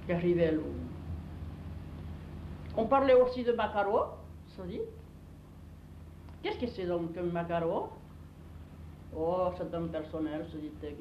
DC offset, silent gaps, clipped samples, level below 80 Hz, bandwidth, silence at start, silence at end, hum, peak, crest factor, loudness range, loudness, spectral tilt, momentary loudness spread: under 0.1%; none; under 0.1%; -52 dBFS; 6.4 kHz; 0 s; 0 s; 50 Hz at -55 dBFS; -14 dBFS; 20 dB; 7 LU; -32 LUFS; -8.5 dB/octave; 23 LU